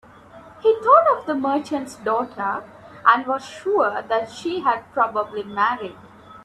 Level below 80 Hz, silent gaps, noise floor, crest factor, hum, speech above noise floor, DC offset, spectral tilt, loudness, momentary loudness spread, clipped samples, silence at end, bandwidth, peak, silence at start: -64 dBFS; none; -45 dBFS; 22 dB; none; 24 dB; under 0.1%; -4.5 dB/octave; -21 LUFS; 12 LU; under 0.1%; 0.05 s; 12.5 kHz; 0 dBFS; 0.35 s